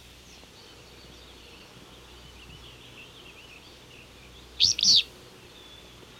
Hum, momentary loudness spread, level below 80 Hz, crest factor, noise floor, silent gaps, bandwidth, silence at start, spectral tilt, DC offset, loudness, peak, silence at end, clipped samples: none; 29 LU; -56 dBFS; 22 dB; -50 dBFS; none; 16.5 kHz; 3 s; 0.5 dB/octave; under 0.1%; -20 LUFS; -10 dBFS; 1.15 s; under 0.1%